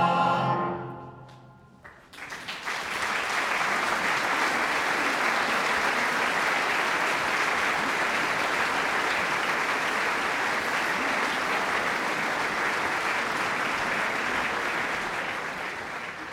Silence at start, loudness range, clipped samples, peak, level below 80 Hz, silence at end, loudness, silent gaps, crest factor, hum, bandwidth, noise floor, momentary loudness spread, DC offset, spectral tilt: 0 s; 4 LU; under 0.1%; -12 dBFS; -60 dBFS; 0 s; -26 LUFS; none; 16 dB; none; 16 kHz; -51 dBFS; 8 LU; under 0.1%; -2.5 dB/octave